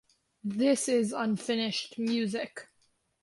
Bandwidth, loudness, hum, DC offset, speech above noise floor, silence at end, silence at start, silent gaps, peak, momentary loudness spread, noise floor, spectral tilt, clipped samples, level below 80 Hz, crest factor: 11.5 kHz; -30 LUFS; none; under 0.1%; 42 dB; 0.6 s; 0.45 s; none; -16 dBFS; 12 LU; -72 dBFS; -4 dB/octave; under 0.1%; -76 dBFS; 16 dB